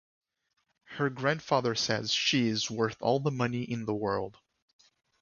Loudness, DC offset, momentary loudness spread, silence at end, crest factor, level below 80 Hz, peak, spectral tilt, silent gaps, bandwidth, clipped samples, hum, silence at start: -30 LUFS; under 0.1%; 7 LU; 0.9 s; 20 dB; -66 dBFS; -12 dBFS; -4.5 dB/octave; none; 7.4 kHz; under 0.1%; none; 0.9 s